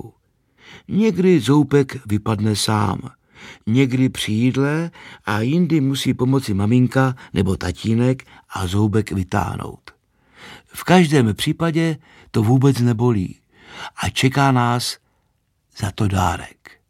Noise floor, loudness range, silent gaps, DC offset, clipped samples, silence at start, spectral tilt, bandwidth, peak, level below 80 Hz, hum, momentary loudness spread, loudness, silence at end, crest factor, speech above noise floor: -67 dBFS; 3 LU; none; under 0.1%; under 0.1%; 0.05 s; -6 dB/octave; 15.5 kHz; 0 dBFS; -46 dBFS; none; 14 LU; -19 LUFS; 0.2 s; 18 dB; 48 dB